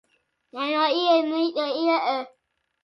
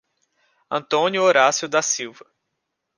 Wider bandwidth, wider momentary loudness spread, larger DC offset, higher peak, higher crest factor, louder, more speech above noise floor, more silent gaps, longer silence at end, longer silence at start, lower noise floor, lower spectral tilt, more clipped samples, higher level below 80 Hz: second, 6 kHz vs 10.5 kHz; about the same, 10 LU vs 12 LU; neither; second, -8 dBFS vs -2 dBFS; about the same, 16 dB vs 20 dB; second, -23 LUFS vs -19 LUFS; second, 36 dB vs 58 dB; neither; second, 0.55 s vs 0.85 s; second, 0.55 s vs 0.7 s; second, -59 dBFS vs -78 dBFS; first, -3.5 dB/octave vs -2 dB/octave; neither; about the same, -80 dBFS vs -76 dBFS